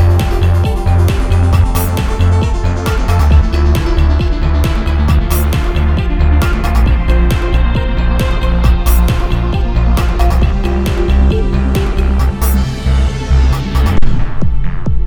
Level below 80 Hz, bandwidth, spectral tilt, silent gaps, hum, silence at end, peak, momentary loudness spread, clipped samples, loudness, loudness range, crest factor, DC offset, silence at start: -12 dBFS; 19.5 kHz; -6.5 dB/octave; none; none; 0 s; 0 dBFS; 4 LU; 0.3%; -13 LUFS; 1 LU; 10 dB; under 0.1%; 0 s